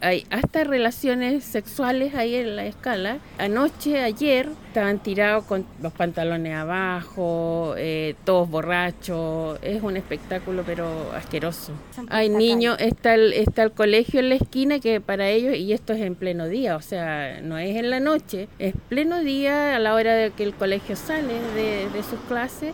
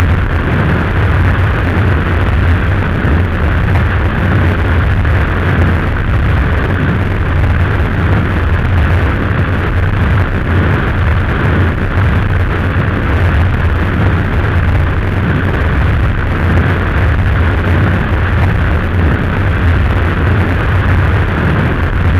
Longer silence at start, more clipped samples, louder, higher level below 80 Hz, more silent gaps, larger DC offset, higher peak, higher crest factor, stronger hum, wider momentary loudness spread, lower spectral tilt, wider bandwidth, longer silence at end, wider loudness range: about the same, 0 s vs 0 s; neither; second, -23 LUFS vs -12 LUFS; second, -46 dBFS vs -16 dBFS; neither; neither; second, -6 dBFS vs 0 dBFS; first, 18 dB vs 10 dB; neither; first, 10 LU vs 2 LU; second, -5.5 dB/octave vs -8.5 dB/octave; first, 18 kHz vs 5.8 kHz; about the same, 0 s vs 0 s; first, 5 LU vs 1 LU